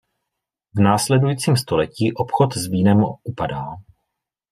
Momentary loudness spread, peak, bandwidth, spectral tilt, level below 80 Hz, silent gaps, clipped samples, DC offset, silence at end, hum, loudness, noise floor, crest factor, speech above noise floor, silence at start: 12 LU; -2 dBFS; 15.5 kHz; -6 dB/octave; -52 dBFS; none; under 0.1%; under 0.1%; 0.7 s; none; -19 LUFS; -81 dBFS; 18 dB; 63 dB; 0.75 s